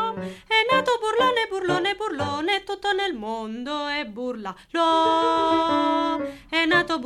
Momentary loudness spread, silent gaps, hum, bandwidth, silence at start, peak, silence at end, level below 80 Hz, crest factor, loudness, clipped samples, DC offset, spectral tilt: 11 LU; none; none; 13 kHz; 0 s; -6 dBFS; 0 s; -56 dBFS; 16 dB; -23 LUFS; under 0.1%; under 0.1%; -4 dB/octave